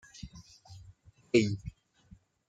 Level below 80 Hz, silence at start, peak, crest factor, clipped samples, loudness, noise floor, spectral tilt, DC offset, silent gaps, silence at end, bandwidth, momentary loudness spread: -58 dBFS; 0.2 s; -12 dBFS; 24 dB; under 0.1%; -30 LUFS; -60 dBFS; -6 dB/octave; under 0.1%; none; 0.8 s; 9.2 kHz; 26 LU